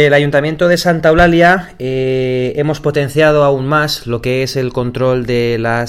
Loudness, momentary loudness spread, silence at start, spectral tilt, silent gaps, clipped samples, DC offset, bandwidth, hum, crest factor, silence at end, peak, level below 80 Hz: -13 LUFS; 8 LU; 0 s; -6 dB/octave; none; under 0.1%; under 0.1%; 16 kHz; none; 12 dB; 0 s; 0 dBFS; -34 dBFS